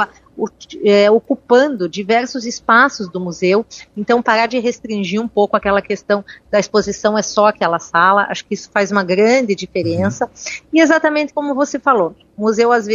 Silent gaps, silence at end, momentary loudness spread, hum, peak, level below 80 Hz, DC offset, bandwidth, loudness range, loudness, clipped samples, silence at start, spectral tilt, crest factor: none; 0 s; 10 LU; none; 0 dBFS; -52 dBFS; under 0.1%; 7.6 kHz; 2 LU; -15 LUFS; under 0.1%; 0 s; -4.5 dB/octave; 16 dB